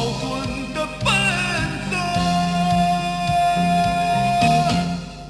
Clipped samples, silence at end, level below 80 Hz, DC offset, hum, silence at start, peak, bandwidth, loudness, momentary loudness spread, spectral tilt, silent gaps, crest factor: under 0.1%; 0 s; -38 dBFS; under 0.1%; 50 Hz at -40 dBFS; 0 s; -4 dBFS; 11 kHz; -20 LUFS; 8 LU; -5 dB/octave; none; 16 dB